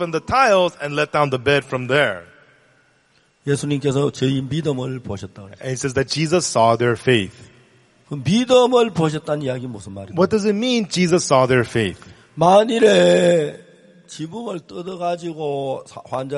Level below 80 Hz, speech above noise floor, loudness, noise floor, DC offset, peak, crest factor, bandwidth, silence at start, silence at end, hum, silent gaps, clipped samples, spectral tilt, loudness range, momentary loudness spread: -52 dBFS; 41 dB; -18 LUFS; -59 dBFS; under 0.1%; -2 dBFS; 18 dB; 11.5 kHz; 0 s; 0 s; none; none; under 0.1%; -5 dB/octave; 6 LU; 17 LU